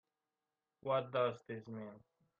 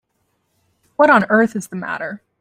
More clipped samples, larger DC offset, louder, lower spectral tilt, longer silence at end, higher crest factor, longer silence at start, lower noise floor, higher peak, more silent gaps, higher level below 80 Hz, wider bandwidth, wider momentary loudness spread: neither; neither; second, -40 LUFS vs -16 LUFS; first, -7.5 dB/octave vs -6 dB/octave; first, 0.4 s vs 0.25 s; about the same, 20 dB vs 18 dB; second, 0.85 s vs 1 s; first, under -90 dBFS vs -68 dBFS; second, -24 dBFS vs -2 dBFS; neither; second, -84 dBFS vs -62 dBFS; second, 7.4 kHz vs 15 kHz; second, 13 LU vs 16 LU